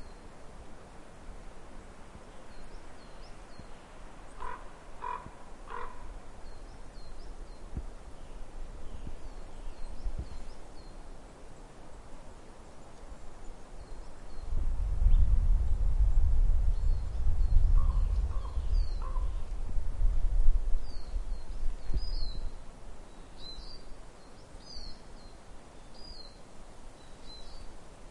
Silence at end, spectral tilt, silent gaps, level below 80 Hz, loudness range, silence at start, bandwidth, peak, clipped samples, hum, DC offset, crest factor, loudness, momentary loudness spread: 0 s; -6 dB/octave; none; -32 dBFS; 19 LU; 0 s; 8.6 kHz; -10 dBFS; under 0.1%; none; under 0.1%; 20 dB; -36 LUFS; 21 LU